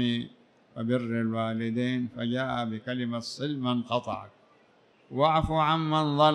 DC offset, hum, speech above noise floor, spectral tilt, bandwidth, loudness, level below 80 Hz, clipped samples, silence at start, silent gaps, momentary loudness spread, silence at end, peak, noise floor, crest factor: under 0.1%; none; 34 dB; -6.5 dB/octave; 10 kHz; -29 LUFS; -52 dBFS; under 0.1%; 0 s; none; 11 LU; 0 s; -8 dBFS; -62 dBFS; 20 dB